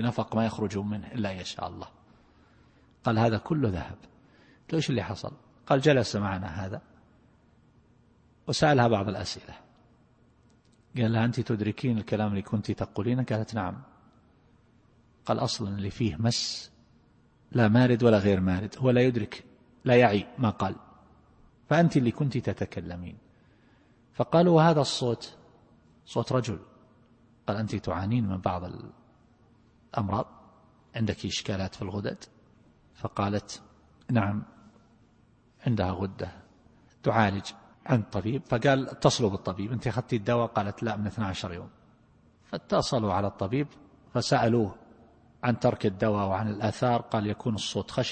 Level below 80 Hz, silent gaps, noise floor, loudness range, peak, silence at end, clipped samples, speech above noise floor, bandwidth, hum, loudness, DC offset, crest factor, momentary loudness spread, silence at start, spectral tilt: -56 dBFS; none; -62 dBFS; 8 LU; -6 dBFS; 0 s; under 0.1%; 35 dB; 8.8 kHz; none; -28 LUFS; under 0.1%; 24 dB; 17 LU; 0 s; -6 dB/octave